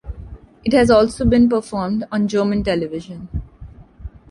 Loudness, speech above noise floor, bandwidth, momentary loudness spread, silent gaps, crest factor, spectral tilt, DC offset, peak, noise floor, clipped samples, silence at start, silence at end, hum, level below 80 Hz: -17 LUFS; 23 dB; 11.5 kHz; 22 LU; none; 16 dB; -6.5 dB/octave; under 0.1%; -2 dBFS; -40 dBFS; under 0.1%; 0.05 s; 0.25 s; none; -34 dBFS